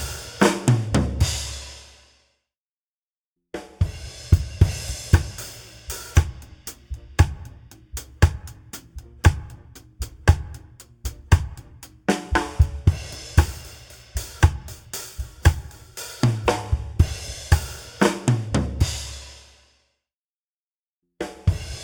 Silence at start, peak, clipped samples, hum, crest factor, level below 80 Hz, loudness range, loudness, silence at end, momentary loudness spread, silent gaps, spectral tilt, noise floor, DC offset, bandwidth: 0 s; 0 dBFS; under 0.1%; none; 24 dB; -30 dBFS; 4 LU; -23 LUFS; 0 s; 18 LU; 2.58-3.36 s, 20.18-21.02 s; -5.5 dB/octave; under -90 dBFS; under 0.1%; 19.5 kHz